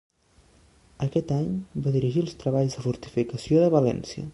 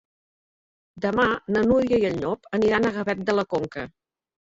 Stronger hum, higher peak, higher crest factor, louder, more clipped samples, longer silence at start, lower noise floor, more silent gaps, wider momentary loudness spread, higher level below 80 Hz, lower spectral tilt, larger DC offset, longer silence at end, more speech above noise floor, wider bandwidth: neither; about the same, -8 dBFS vs -6 dBFS; about the same, 18 dB vs 18 dB; about the same, -25 LUFS vs -23 LUFS; neither; about the same, 1 s vs 0.95 s; second, -59 dBFS vs under -90 dBFS; neither; about the same, 9 LU vs 9 LU; about the same, -54 dBFS vs -52 dBFS; first, -8 dB/octave vs -6.5 dB/octave; neither; second, 0 s vs 0.55 s; second, 35 dB vs over 67 dB; first, 11.5 kHz vs 7.8 kHz